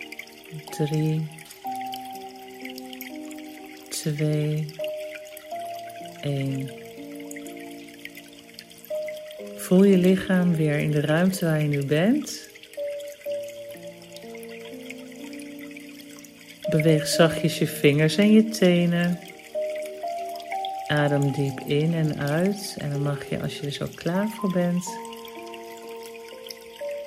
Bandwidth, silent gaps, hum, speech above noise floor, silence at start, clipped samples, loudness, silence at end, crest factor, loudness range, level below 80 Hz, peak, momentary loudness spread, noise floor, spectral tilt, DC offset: 16 kHz; none; none; 23 dB; 0 s; under 0.1%; -24 LUFS; 0 s; 22 dB; 13 LU; -62 dBFS; -4 dBFS; 20 LU; -46 dBFS; -6 dB/octave; under 0.1%